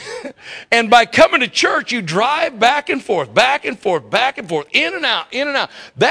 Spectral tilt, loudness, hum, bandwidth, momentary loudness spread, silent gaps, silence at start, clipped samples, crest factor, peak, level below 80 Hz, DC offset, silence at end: -3 dB/octave; -15 LUFS; none; 11 kHz; 10 LU; none; 0 s; 0.2%; 16 dB; 0 dBFS; -54 dBFS; under 0.1%; 0 s